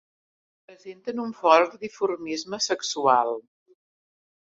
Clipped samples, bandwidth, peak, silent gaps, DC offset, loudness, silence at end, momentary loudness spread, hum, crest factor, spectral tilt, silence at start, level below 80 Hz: under 0.1%; 8 kHz; -2 dBFS; none; under 0.1%; -24 LUFS; 1.2 s; 15 LU; none; 24 dB; -2.5 dB/octave; 0.7 s; -74 dBFS